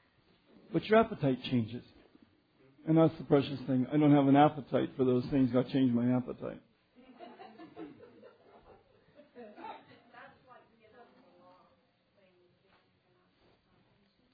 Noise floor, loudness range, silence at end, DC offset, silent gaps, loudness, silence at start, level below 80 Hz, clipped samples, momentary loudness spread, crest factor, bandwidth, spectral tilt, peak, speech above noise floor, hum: -71 dBFS; 24 LU; 4.05 s; under 0.1%; none; -29 LUFS; 0.7 s; -66 dBFS; under 0.1%; 26 LU; 20 dB; 5 kHz; -10.5 dB/octave; -12 dBFS; 42 dB; none